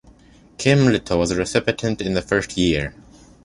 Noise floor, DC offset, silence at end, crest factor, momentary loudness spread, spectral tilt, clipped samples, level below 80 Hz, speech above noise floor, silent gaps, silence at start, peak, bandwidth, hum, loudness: -49 dBFS; under 0.1%; 0.55 s; 20 dB; 7 LU; -5.5 dB/octave; under 0.1%; -40 dBFS; 30 dB; none; 0.6 s; -2 dBFS; 11.5 kHz; none; -20 LUFS